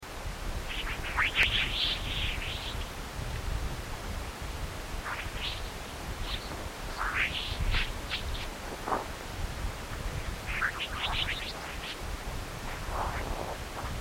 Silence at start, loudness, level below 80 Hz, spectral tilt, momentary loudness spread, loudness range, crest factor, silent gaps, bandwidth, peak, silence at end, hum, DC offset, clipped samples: 0 s; -34 LUFS; -38 dBFS; -3 dB/octave; 10 LU; 7 LU; 24 dB; none; 16.5 kHz; -8 dBFS; 0 s; none; under 0.1%; under 0.1%